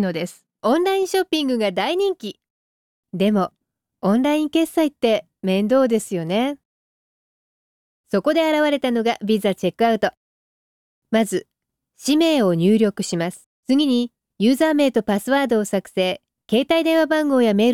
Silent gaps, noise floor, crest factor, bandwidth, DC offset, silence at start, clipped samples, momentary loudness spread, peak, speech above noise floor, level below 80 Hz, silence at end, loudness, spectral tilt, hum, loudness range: 2.50-3.03 s, 6.65-8.04 s, 10.17-11.02 s, 13.46-13.63 s; under -90 dBFS; 14 dB; 16.5 kHz; under 0.1%; 0 s; under 0.1%; 9 LU; -6 dBFS; over 71 dB; -64 dBFS; 0 s; -20 LUFS; -5.5 dB/octave; none; 3 LU